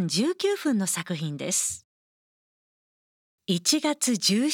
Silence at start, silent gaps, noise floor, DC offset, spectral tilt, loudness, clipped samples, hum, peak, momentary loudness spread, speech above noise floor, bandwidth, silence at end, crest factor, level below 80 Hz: 0 s; 1.84-3.38 s; under -90 dBFS; under 0.1%; -3.5 dB/octave; -25 LUFS; under 0.1%; none; -8 dBFS; 8 LU; over 64 dB; 18 kHz; 0 s; 20 dB; -76 dBFS